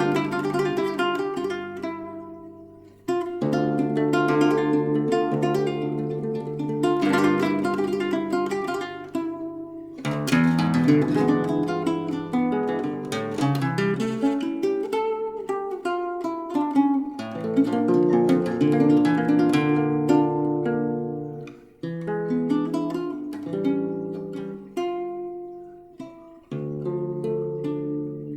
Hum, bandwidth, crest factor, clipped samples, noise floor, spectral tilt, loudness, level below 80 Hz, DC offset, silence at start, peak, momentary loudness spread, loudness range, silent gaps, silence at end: none; 14.5 kHz; 18 dB; under 0.1%; -46 dBFS; -7 dB/octave; -24 LUFS; -62 dBFS; under 0.1%; 0 s; -6 dBFS; 13 LU; 9 LU; none; 0 s